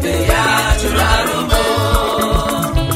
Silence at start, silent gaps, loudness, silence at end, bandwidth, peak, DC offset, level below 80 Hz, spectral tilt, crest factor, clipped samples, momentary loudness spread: 0 s; none; -15 LUFS; 0 s; 16.5 kHz; 0 dBFS; under 0.1%; -20 dBFS; -4 dB/octave; 14 dB; under 0.1%; 3 LU